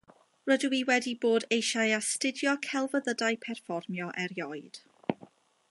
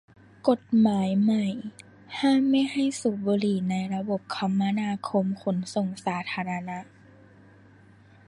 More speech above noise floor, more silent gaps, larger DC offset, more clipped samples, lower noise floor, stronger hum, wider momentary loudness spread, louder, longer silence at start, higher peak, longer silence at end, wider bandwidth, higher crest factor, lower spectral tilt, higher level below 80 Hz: about the same, 27 dB vs 29 dB; neither; neither; neither; about the same, -57 dBFS vs -54 dBFS; neither; about the same, 11 LU vs 9 LU; second, -30 LUFS vs -26 LUFS; about the same, 0.45 s vs 0.45 s; second, -12 dBFS vs -8 dBFS; second, 0.45 s vs 1.45 s; about the same, 11.5 kHz vs 11.5 kHz; about the same, 20 dB vs 18 dB; second, -3 dB/octave vs -6.5 dB/octave; second, -82 dBFS vs -68 dBFS